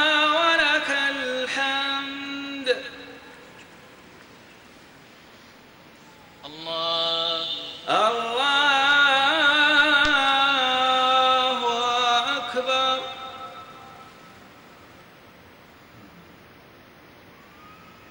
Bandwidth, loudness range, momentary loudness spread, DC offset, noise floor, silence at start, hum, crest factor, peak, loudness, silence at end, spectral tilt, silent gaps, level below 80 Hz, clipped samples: 16 kHz; 15 LU; 20 LU; under 0.1%; -49 dBFS; 0 s; none; 20 dB; -6 dBFS; -20 LUFS; 0.35 s; -1.5 dB/octave; none; -60 dBFS; under 0.1%